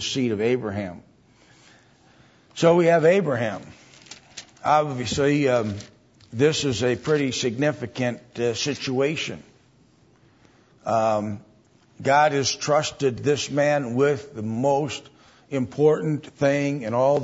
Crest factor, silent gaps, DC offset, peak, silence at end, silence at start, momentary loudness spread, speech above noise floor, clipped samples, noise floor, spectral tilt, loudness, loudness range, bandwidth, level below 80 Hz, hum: 18 dB; none; under 0.1%; -6 dBFS; 0 s; 0 s; 15 LU; 35 dB; under 0.1%; -57 dBFS; -5 dB/octave; -23 LUFS; 5 LU; 8 kHz; -60 dBFS; none